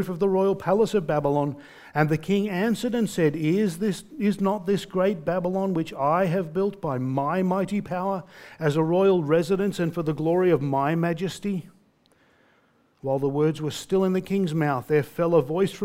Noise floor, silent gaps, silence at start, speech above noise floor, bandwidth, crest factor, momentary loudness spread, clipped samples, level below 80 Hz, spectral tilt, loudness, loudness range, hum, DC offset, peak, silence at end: -63 dBFS; none; 0 s; 39 dB; 16 kHz; 20 dB; 7 LU; under 0.1%; -58 dBFS; -7 dB/octave; -24 LUFS; 4 LU; none; under 0.1%; -4 dBFS; 0 s